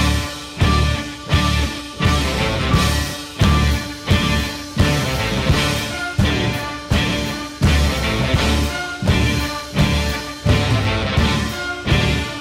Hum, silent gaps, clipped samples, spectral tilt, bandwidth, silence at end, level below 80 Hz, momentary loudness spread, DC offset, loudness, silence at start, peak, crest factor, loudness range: none; none; under 0.1%; -5 dB/octave; 16 kHz; 0 s; -24 dBFS; 6 LU; under 0.1%; -19 LUFS; 0 s; -6 dBFS; 12 dB; 1 LU